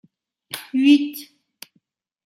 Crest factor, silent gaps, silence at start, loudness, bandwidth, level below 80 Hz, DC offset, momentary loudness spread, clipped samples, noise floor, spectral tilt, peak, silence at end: 20 dB; none; 0.55 s; -18 LUFS; 16 kHz; -78 dBFS; under 0.1%; 19 LU; under 0.1%; -67 dBFS; -2.5 dB/octave; -4 dBFS; 1 s